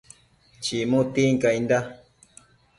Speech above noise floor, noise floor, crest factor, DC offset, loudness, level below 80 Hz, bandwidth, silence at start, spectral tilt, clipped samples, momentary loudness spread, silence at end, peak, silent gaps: 35 dB; -57 dBFS; 18 dB; under 0.1%; -23 LUFS; -60 dBFS; 11.5 kHz; 0.6 s; -5.5 dB/octave; under 0.1%; 10 LU; 0.85 s; -8 dBFS; none